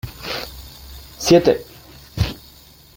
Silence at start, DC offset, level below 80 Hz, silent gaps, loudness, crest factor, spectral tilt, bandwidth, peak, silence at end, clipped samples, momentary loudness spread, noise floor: 0.05 s; under 0.1%; -38 dBFS; none; -19 LUFS; 20 dB; -5 dB/octave; 17 kHz; -2 dBFS; 0.6 s; under 0.1%; 24 LU; -46 dBFS